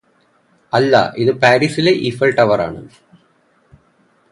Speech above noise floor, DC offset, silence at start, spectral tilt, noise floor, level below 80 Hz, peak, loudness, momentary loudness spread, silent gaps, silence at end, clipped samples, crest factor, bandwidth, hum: 43 dB; under 0.1%; 0.75 s; -6 dB/octave; -57 dBFS; -52 dBFS; 0 dBFS; -14 LUFS; 7 LU; none; 1.45 s; under 0.1%; 16 dB; 11.5 kHz; none